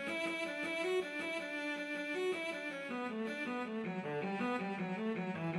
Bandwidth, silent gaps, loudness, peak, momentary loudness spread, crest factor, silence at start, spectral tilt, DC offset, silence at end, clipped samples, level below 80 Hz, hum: 14 kHz; none; -39 LUFS; -26 dBFS; 4 LU; 12 dB; 0 s; -5.5 dB/octave; under 0.1%; 0 s; under 0.1%; -88 dBFS; none